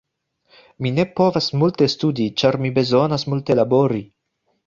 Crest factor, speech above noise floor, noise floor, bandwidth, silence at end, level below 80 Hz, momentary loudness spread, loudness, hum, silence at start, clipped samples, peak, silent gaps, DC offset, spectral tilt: 16 dB; 52 dB; -70 dBFS; 7.4 kHz; 0.6 s; -56 dBFS; 5 LU; -19 LUFS; none; 0.8 s; under 0.1%; -2 dBFS; none; under 0.1%; -6.5 dB/octave